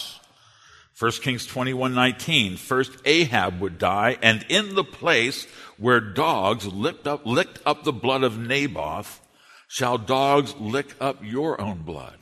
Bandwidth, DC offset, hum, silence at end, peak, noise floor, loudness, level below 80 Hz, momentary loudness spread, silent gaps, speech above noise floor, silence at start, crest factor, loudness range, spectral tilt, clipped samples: 13.5 kHz; under 0.1%; none; 0.1 s; 0 dBFS; -54 dBFS; -23 LUFS; -58 dBFS; 11 LU; none; 31 dB; 0 s; 24 dB; 5 LU; -4 dB/octave; under 0.1%